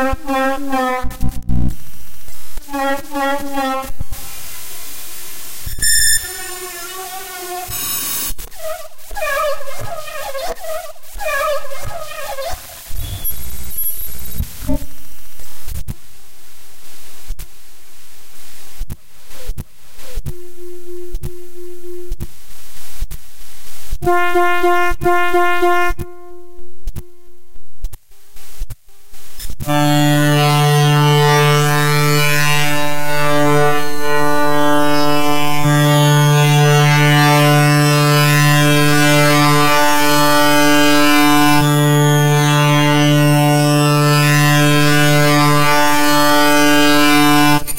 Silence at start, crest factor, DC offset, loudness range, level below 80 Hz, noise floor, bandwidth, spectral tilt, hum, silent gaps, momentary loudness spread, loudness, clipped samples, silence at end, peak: 0 s; 10 dB; under 0.1%; 22 LU; -32 dBFS; -40 dBFS; 16.5 kHz; -4.5 dB/octave; none; none; 22 LU; -13 LUFS; under 0.1%; 0 s; -4 dBFS